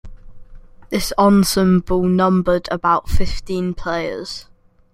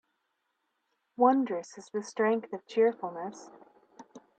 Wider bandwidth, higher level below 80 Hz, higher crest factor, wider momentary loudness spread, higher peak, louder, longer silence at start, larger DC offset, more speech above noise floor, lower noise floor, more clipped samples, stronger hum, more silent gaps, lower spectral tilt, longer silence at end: first, 15.5 kHz vs 9 kHz; first, -30 dBFS vs -84 dBFS; second, 16 dB vs 22 dB; second, 11 LU vs 16 LU; first, -2 dBFS vs -10 dBFS; first, -18 LUFS vs -30 LUFS; second, 0.05 s vs 1.2 s; neither; second, 23 dB vs 50 dB; second, -39 dBFS vs -80 dBFS; neither; neither; neither; about the same, -6 dB/octave vs -5.5 dB/octave; first, 0.5 s vs 0.2 s